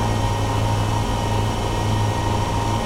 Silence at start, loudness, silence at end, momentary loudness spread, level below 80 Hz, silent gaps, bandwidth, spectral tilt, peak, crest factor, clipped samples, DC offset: 0 s; -22 LUFS; 0 s; 1 LU; -28 dBFS; none; 15.5 kHz; -5.5 dB/octave; -8 dBFS; 12 dB; under 0.1%; under 0.1%